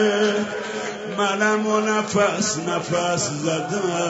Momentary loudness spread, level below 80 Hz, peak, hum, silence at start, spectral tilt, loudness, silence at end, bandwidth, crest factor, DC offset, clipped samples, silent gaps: 8 LU; -64 dBFS; -6 dBFS; none; 0 s; -3.5 dB/octave; -22 LUFS; 0 s; 8 kHz; 16 dB; under 0.1%; under 0.1%; none